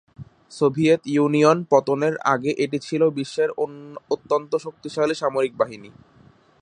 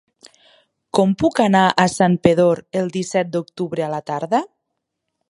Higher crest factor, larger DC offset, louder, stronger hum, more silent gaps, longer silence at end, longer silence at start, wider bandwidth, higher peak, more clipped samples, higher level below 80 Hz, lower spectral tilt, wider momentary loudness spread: about the same, 20 dB vs 18 dB; neither; second, -22 LUFS vs -18 LUFS; neither; neither; about the same, 0.75 s vs 0.85 s; second, 0.2 s vs 0.95 s; second, 10 kHz vs 11.5 kHz; about the same, -2 dBFS vs 0 dBFS; neither; second, -64 dBFS vs -54 dBFS; about the same, -6 dB/octave vs -5.5 dB/octave; about the same, 11 LU vs 10 LU